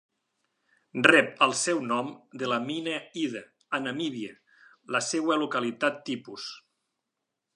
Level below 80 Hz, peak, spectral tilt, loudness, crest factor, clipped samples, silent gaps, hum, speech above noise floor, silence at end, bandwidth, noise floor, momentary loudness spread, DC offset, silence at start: -80 dBFS; -2 dBFS; -3 dB/octave; -27 LUFS; 28 dB; under 0.1%; none; none; 57 dB; 0.95 s; 11.5 kHz; -84 dBFS; 18 LU; under 0.1%; 0.95 s